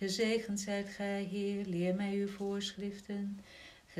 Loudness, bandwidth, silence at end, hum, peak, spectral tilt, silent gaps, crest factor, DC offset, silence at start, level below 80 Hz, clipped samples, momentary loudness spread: -37 LUFS; 14 kHz; 0 s; none; -22 dBFS; -5 dB/octave; none; 16 dB; under 0.1%; 0 s; -68 dBFS; under 0.1%; 10 LU